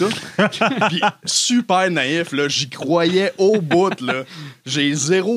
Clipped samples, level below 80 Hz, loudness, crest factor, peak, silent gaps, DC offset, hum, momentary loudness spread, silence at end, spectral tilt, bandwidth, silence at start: under 0.1%; -70 dBFS; -18 LUFS; 16 dB; -2 dBFS; none; under 0.1%; none; 7 LU; 0 s; -3.5 dB/octave; 15 kHz; 0 s